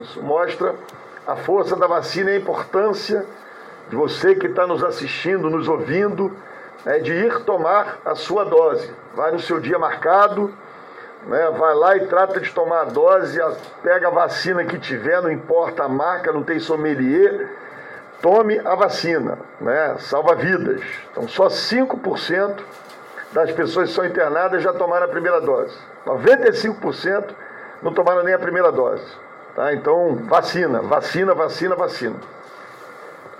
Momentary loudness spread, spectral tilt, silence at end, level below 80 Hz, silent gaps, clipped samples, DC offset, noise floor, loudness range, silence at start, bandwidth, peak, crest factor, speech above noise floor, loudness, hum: 18 LU; -5.5 dB/octave; 0 s; -66 dBFS; none; under 0.1%; under 0.1%; -39 dBFS; 3 LU; 0 s; 12 kHz; -4 dBFS; 16 dB; 20 dB; -19 LUFS; none